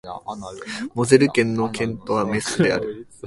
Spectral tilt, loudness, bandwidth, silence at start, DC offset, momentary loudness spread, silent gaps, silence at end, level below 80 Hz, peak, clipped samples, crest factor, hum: -5 dB/octave; -20 LUFS; 11.5 kHz; 0.05 s; under 0.1%; 17 LU; none; 0 s; -52 dBFS; 0 dBFS; under 0.1%; 20 dB; none